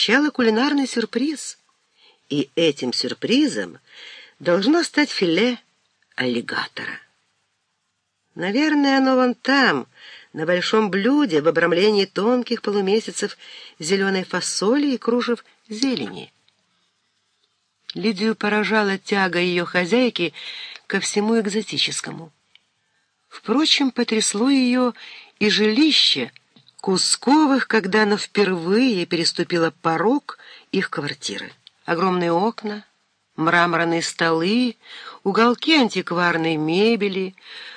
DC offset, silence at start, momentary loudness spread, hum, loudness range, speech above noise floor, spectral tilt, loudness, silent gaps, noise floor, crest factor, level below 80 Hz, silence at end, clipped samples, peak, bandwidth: under 0.1%; 0 s; 15 LU; none; 6 LU; 53 dB; -4 dB/octave; -20 LUFS; none; -73 dBFS; 20 dB; -74 dBFS; 0 s; under 0.1%; -2 dBFS; 10.5 kHz